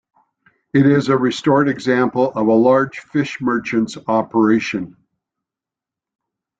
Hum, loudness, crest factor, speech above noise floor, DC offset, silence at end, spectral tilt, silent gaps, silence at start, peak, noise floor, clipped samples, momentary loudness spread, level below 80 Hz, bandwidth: none; -17 LUFS; 16 dB; 71 dB; under 0.1%; 1.7 s; -7 dB/octave; none; 0.75 s; -2 dBFS; -87 dBFS; under 0.1%; 7 LU; -58 dBFS; 8 kHz